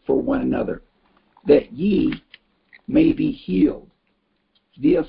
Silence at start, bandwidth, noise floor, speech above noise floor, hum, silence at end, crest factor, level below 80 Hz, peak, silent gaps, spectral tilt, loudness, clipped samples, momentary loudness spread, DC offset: 0.1 s; 5.2 kHz; -68 dBFS; 49 dB; none; 0 s; 18 dB; -44 dBFS; -2 dBFS; none; -12 dB/octave; -20 LUFS; under 0.1%; 16 LU; under 0.1%